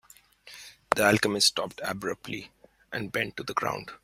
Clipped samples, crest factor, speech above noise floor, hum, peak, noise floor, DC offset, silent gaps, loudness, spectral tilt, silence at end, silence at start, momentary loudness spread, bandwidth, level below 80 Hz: under 0.1%; 28 dB; 26 dB; none; -2 dBFS; -54 dBFS; under 0.1%; none; -27 LUFS; -3 dB/octave; 0.1 s; 0.45 s; 21 LU; 16 kHz; -62 dBFS